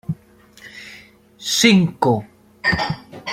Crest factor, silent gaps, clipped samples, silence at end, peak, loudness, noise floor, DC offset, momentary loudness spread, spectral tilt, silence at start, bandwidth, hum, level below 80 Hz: 20 dB; none; under 0.1%; 0 s; -2 dBFS; -18 LUFS; -49 dBFS; under 0.1%; 24 LU; -4 dB/octave; 0.1 s; 16 kHz; 60 Hz at -40 dBFS; -48 dBFS